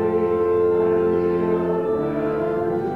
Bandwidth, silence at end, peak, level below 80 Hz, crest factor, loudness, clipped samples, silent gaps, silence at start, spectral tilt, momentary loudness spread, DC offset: 4.4 kHz; 0 s; -10 dBFS; -50 dBFS; 10 dB; -21 LUFS; under 0.1%; none; 0 s; -9.5 dB/octave; 4 LU; under 0.1%